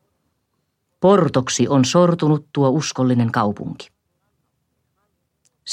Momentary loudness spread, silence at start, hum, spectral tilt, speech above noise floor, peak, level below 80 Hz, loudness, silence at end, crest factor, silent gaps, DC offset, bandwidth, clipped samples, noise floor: 15 LU; 1 s; none; -5.5 dB/octave; 55 dB; -2 dBFS; -60 dBFS; -17 LUFS; 0 s; 16 dB; none; under 0.1%; 10.5 kHz; under 0.1%; -72 dBFS